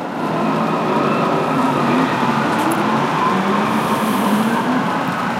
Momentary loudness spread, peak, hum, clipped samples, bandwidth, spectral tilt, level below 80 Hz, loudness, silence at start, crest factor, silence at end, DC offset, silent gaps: 2 LU; -4 dBFS; none; under 0.1%; 16.5 kHz; -5.5 dB/octave; -56 dBFS; -17 LUFS; 0 s; 14 dB; 0 s; under 0.1%; none